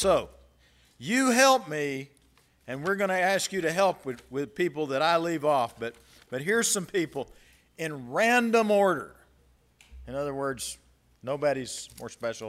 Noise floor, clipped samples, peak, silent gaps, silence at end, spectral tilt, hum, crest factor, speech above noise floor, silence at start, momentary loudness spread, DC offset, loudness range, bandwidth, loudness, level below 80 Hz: -63 dBFS; under 0.1%; -6 dBFS; none; 0 s; -3.5 dB/octave; none; 22 dB; 36 dB; 0 s; 16 LU; under 0.1%; 3 LU; 16 kHz; -27 LUFS; -58 dBFS